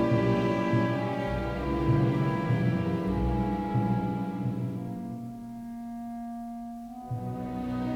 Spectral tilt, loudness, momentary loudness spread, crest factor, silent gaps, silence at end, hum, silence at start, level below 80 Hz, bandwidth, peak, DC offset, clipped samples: -8.5 dB/octave; -30 LUFS; 13 LU; 14 dB; none; 0 s; none; 0 s; -44 dBFS; 11 kHz; -14 dBFS; under 0.1%; under 0.1%